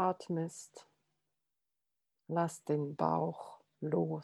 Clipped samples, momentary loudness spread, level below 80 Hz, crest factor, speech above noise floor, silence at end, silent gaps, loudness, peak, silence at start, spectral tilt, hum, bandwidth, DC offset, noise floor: under 0.1%; 16 LU; -84 dBFS; 20 dB; 53 dB; 0 s; none; -36 LUFS; -16 dBFS; 0 s; -7 dB/octave; none; 12.5 kHz; under 0.1%; -89 dBFS